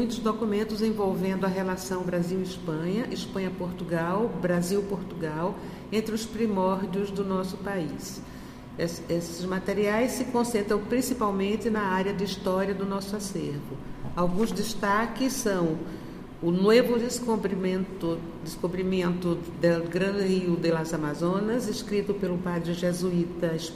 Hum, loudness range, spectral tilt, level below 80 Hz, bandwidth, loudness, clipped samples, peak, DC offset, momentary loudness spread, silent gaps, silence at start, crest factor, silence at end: none; 4 LU; -5.5 dB/octave; -50 dBFS; 15.5 kHz; -28 LUFS; under 0.1%; -8 dBFS; under 0.1%; 7 LU; none; 0 s; 20 dB; 0 s